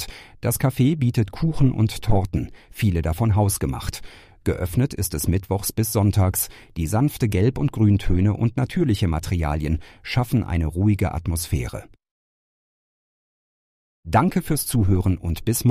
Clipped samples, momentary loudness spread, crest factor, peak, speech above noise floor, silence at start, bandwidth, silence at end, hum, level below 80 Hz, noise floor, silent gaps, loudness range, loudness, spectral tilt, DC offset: under 0.1%; 8 LU; 16 dB; -6 dBFS; over 69 dB; 0 s; 15.5 kHz; 0 s; none; -34 dBFS; under -90 dBFS; 12.11-14.03 s; 6 LU; -22 LUFS; -6 dB/octave; under 0.1%